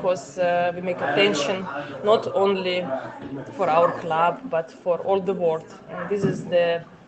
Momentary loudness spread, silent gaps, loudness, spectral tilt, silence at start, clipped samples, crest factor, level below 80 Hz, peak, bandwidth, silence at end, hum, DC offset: 11 LU; none; -23 LUFS; -5 dB/octave; 0 s; under 0.1%; 20 dB; -64 dBFS; -4 dBFS; 8.6 kHz; 0.1 s; none; under 0.1%